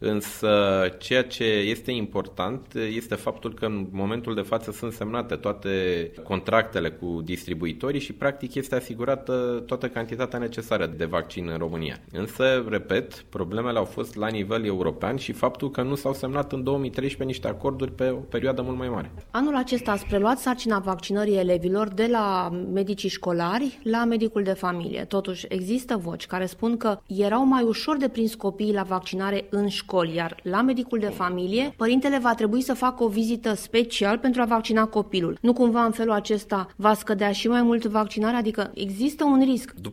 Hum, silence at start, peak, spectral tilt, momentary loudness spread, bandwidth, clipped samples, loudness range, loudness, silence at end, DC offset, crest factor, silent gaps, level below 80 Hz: none; 0 s; -4 dBFS; -5.5 dB/octave; 8 LU; 16.5 kHz; under 0.1%; 5 LU; -25 LUFS; 0 s; under 0.1%; 20 dB; none; -50 dBFS